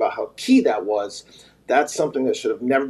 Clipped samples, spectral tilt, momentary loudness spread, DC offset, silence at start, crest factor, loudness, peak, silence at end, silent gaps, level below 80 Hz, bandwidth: under 0.1%; -4 dB/octave; 10 LU; under 0.1%; 0 s; 16 dB; -21 LUFS; -6 dBFS; 0 s; none; -66 dBFS; 12.5 kHz